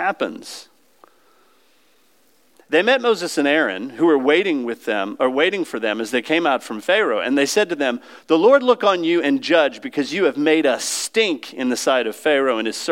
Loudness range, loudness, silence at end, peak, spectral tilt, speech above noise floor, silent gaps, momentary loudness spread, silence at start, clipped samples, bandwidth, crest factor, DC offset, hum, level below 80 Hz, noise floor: 4 LU; -18 LUFS; 0 s; -2 dBFS; -3 dB/octave; 41 dB; none; 8 LU; 0 s; under 0.1%; 16.5 kHz; 18 dB; under 0.1%; none; -82 dBFS; -59 dBFS